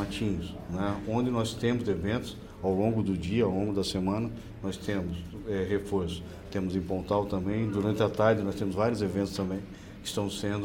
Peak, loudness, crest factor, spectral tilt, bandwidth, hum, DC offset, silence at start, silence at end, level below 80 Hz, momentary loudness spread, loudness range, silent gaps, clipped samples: -10 dBFS; -30 LUFS; 20 dB; -6.5 dB/octave; 17 kHz; none; under 0.1%; 0 s; 0 s; -48 dBFS; 9 LU; 3 LU; none; under 0.1%